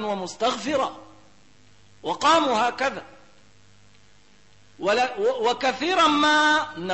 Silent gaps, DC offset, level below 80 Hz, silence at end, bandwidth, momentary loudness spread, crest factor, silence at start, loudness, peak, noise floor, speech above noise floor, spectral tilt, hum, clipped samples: none; 0.2%; -62 dBFS; 0 s; 8.6 kHz; 11 LU; 16 dB; 0 s; -22 LUFS; -8 dBFS; -57 dBFS; 35 dB; -2.5 dB/octave; none; under 0.1%